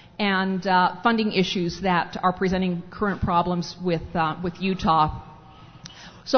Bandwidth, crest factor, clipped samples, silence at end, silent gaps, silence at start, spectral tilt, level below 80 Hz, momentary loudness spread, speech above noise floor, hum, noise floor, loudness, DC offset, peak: 6.6 kHz; 18 dB; under 0.1%; 0 s; none; 0.2 s; -6 dB/octave; -46 dBFS; 12 LU; 23 dB; none; -46 dBFS; -23 LUFS; under 0.1%; -6 dBFS